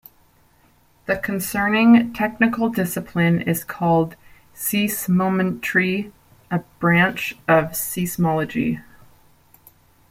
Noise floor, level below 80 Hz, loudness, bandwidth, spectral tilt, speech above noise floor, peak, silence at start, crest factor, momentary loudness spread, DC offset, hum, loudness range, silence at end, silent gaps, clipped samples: -57 dBFS; -54 dBFS; -20 LUFS; 16.5 kHz; -5.5 dB/octave; 37 dB; -2 dBFS; 1.1 s; 18 dB; 11 LU; under 0.1%; none; 3 LU; 1.3 s; none; under 0.1%